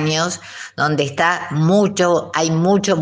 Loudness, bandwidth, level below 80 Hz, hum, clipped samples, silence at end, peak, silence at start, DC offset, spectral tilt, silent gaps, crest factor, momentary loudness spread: -17 LUFS; 10 kHz; -60 dBFS; none; under 0.1%; 0 s; 0 dBFS; 0 s; under 0.1%; -5 dB/octave; none; 16 dB; 7 LU